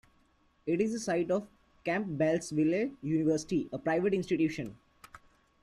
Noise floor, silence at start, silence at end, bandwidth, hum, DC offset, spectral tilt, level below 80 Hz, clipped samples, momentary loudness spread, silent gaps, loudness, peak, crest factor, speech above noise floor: -68 dBFS; 0.65 s; 0.45 s; 12 kHz; none; under 0.1%; -6 dB/octave; -66 dBFS; under 0.1%; 5 LU; none; -31 LUFS; -16 dBFS; 16 dB; 38 dB